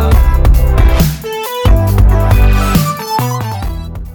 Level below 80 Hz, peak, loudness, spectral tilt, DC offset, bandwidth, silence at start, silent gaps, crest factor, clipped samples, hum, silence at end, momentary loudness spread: -12 dBFS; 0 dBFS; -12 LUFS; -6 dB/octave; under 0.1%; over 20 kHz; 0 s; none; 10 dB; under 0.1%; none; 0 s; 9 LU